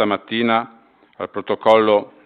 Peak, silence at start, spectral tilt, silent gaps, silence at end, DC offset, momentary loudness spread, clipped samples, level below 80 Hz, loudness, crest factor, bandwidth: 0 dBFS; 0 s; -6.5 dB/octave; none; 0.2 s; under 0.1%; 16 LU; under 0.1%; -62 dBFS; -18 LUFS; 18 dB; 7.2 kHz